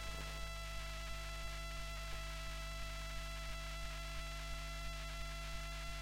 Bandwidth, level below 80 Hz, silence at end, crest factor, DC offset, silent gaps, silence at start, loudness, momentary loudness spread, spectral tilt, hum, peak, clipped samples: 16.5 kHz; -48 dBFS; 0 s; 12 dB; under 0.1%; none; 0 s; -46 LUFS; 0 LU; -3 dB/octave; 50 Hz at -45 dBFS; -32 dBFS; under 0.1%